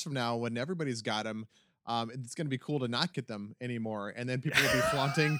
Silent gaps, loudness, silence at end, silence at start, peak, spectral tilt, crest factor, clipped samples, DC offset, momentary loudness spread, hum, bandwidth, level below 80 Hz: none; -33 LUFS; 0 s; 0 s; -10 dBFS; -4.5 dB/octave; 22 dB; under 0.1%; under 0.1%; 13 LU; none; over 20 kHz; -62 dBFS